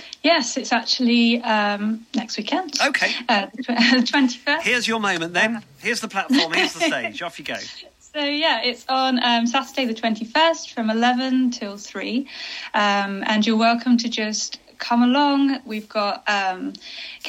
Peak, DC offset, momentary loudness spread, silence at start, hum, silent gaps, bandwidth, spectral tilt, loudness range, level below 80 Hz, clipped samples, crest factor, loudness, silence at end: -4 dBFS; under 0.1%; 12 LU; 0 s; none; none; 14.5 kHz; -3 dB/octave; 2 LU; -68 dBFS; under 0.1%; 18 dB; -20 LUFS; 0 s